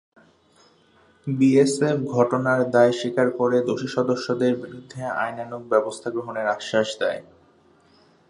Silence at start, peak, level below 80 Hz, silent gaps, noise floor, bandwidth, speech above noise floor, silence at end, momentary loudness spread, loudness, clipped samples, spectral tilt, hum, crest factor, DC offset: 1.25 s; -4 dBFS; -68 dBFS; none; -58 dBFS; 11.5 kHz; 36 dB; 1.1 s; 11 LU; -22 LUFS; under 0.1%; -6 dB/octave; none; 20 dB; under 0.1%